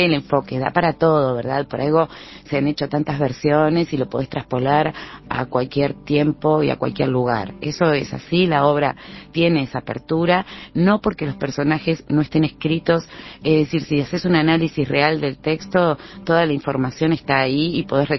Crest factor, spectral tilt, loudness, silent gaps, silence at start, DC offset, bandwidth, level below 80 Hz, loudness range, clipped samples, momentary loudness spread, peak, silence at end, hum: 20 dB; -7.5 dB/octave; -20 LUFS; none; 0 s; under 0.1%; 6.2 kHz; -48 dBFS; 2 LU; under 0.1%; 8 LU; 0 dBFS; 0 s; none